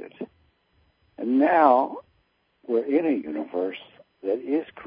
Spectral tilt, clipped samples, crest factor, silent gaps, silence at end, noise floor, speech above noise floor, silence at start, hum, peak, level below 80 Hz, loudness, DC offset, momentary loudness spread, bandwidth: -9.5 dB/octave; under 0.1%; 22 dB; none; 0 s; -68 dBFS; 45 dB; 0 s; none; -4 dBFS; -72 dBFS; -24 LUFS; under 0.1%; 23 LU; 5.2 kHz